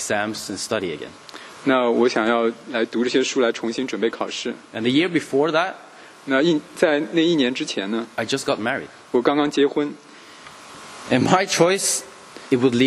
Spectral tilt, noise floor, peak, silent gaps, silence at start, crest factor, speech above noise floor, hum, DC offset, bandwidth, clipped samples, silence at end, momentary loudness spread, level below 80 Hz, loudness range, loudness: -4 dB/octave; -43 dBFS; 0 dBFS; none; 0 s; 22 dB; 22 dB; none; under 0.1%; 13 kHz; under 0.1%; 0 s; 20 LU; -64 dBFS; 2 LU; -21 LUFS